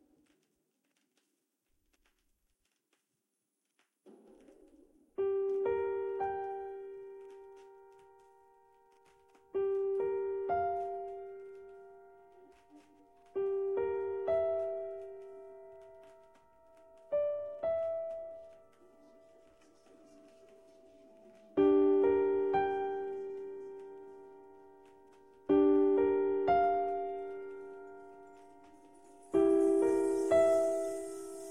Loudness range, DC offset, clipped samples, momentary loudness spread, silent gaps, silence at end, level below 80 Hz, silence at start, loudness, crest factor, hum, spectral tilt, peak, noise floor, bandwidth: 10 LU; under 0.1%; under 0.1%; 24 LU; none; 0 s; -70 dBFS; 4.05 s; -32 LUFS; 18 dB; none; -6 dB/octave; -16 dBFS; -85 dBFS; 11.5 kHz